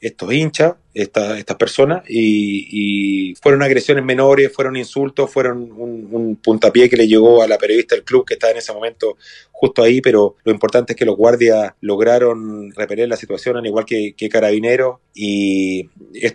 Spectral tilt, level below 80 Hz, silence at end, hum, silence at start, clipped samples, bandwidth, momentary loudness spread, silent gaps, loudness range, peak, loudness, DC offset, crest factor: -5.5 dB/octave; -56 dBFS; 0 s; none; 0.05 s; under 0.1%; 10.5 kHz; 11 LU; none; 4 LU; 0 dBFS; -15 LUFS; under 0.1%; 14 dB